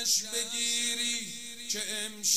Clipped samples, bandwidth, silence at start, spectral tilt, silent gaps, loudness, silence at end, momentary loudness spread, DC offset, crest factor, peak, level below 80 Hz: under 0.1%; 16 kHz; 0 s; 1 dB/octave; none; -30 LUFS; 0 s; 7 LU; 0.3%; 20 dB; -12 dBFS; -72 dBFS